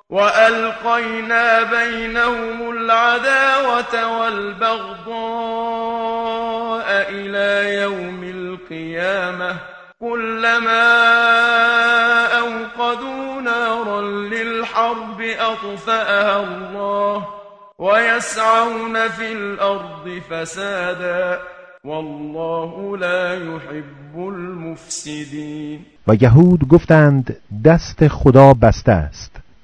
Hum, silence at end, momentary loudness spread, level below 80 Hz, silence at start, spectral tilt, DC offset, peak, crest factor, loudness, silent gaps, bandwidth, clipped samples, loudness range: none; 0.2 s; 17 LU; -40 dBFS; 0.1 s; -6 dB/octave; under 0.1%; 0 dBFS; 16 dB; -16 LUFS; none; 10.5 kHz; 0.1%; 10 LU